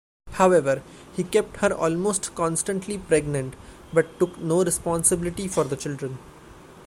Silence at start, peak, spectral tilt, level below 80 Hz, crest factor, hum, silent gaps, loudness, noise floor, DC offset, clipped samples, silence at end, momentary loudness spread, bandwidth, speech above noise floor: 0.25 s; -4 dBFS; -4.5 dB/octave; -50 dBFS; 20 dB; none; none; -24 LUFS; -46 dBFS; under 0.1%; under 0.1%; 0 s; 11 LU; 16 kHz; 23 dB